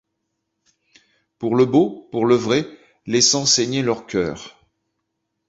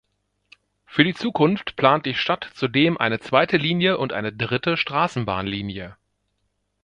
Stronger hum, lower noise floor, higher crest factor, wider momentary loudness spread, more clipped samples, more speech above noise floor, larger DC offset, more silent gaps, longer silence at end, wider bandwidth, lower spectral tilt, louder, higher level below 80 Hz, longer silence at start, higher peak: second, none vs 50 Hz at -55 dBFS; about the same, -76 dBFS vs -73 dBFS; about the same, 20 dB vs 22 dB; first, 13 LU vs 8 LU; neither; first, 57 dB vs 51 dB; neither; neither; about the same, 1 s vs 0.9 s; second, 8 kHz vs 9.8 kHz; second, -3.5 dB/octave vs -6.5 dB/octave; first, -18 LUFS vs -21 LUFS; about the same, -56 dBFS vs -54 dBFS; first, 1.4 s vs 0.9 s; about the same, -2 dBFS vs 0 dBFS